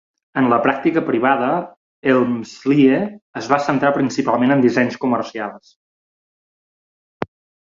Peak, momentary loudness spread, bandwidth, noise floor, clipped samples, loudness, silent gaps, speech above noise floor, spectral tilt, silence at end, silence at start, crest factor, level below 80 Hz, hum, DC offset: 0 dBFS; 15 LU; 7.6 kHz; under -90 dBFS; under 0.1%; -18 LUFS; 1.77-2.03 s, 3.22-3.33 s, 5.76-7.20 s; over 73 dB; -6.5 dB/octave; 0.5 s; 0.35 s; 18 dB; -60 dBFS; none; under 0.1%